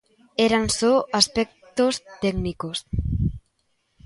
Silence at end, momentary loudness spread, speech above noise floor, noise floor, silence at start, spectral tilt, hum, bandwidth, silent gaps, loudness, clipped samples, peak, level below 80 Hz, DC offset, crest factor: 0.65 s; 9 LU; 48 dB; -70 dBFS; 0.4 s; -4 dB/octave; none; 11.5 kHz; none; -23 LUFS; under 0.1%; -2 dBFS; -38 dBFS; under 0.1%; 20 dB